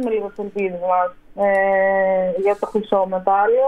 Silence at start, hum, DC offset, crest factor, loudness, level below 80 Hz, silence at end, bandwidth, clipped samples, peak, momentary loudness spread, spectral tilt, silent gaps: 0 s; none; under 0.1%; 16 dB; -19 LUFS; -54 dBFS; 0 s; 9.8 kHz; under 0.1%; -4 dBFS; 8 LU; -7.5 dB/octave; none